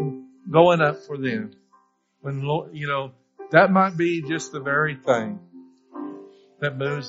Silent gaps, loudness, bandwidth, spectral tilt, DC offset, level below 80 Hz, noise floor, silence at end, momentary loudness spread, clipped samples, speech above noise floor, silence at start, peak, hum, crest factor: none; -22 LUFS; 7.6 kHz; -5 dB/octave; under 0.1%; -66 dBFS; -62 dBFS; 0 s; 21 LU; under 0.1%; 40 dB; 0 s; 0 dBFS; none; 22 dB